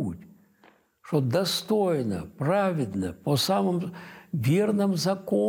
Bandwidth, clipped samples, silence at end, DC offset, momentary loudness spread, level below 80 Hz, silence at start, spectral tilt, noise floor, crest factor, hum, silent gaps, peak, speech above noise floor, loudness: 17 kHz; under 0.1%; 0 s; under 0.1%; 10 LU; -62 dBFS; 0 s; -6 dB/octave; -60 dBFS; 14 dB; none; none; -12 dBFS; 35 dB; -26 LUFS